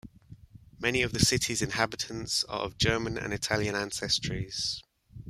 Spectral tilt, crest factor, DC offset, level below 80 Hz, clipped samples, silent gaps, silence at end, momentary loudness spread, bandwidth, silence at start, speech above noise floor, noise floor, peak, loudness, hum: -3 dB/octave; 24 dB; under 0.1%; -50 dBFS; under 0.1%; none; 0 s; 8 LU; 15.5 kHz; 0.05 s; 22 dB; -52 dBFS; -8 dBFS; -29 LUFS; none